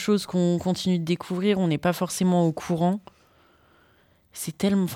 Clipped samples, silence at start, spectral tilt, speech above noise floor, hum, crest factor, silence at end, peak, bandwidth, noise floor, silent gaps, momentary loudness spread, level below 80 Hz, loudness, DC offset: under 0.1%; 0 s; -6 dB/octave; 37 dB; none; 14 dB; 0 s; -10 dBFS; 16 kHz; -61 dBFS; none; 8 LU; -60 dBFS; -25 LUFS; under 0.1%